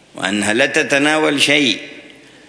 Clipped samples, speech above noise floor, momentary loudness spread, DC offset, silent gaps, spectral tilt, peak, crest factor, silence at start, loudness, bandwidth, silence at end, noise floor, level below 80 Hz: under 0.1%; 26 dB; 9 LU; under 0.1%; none; -2.5 dB/octave; 0 dBFS; 16 dB; 0.15 s; -14 LUFS; 11 kHz; 0.4 s; -41 dBFS; -62 dBFS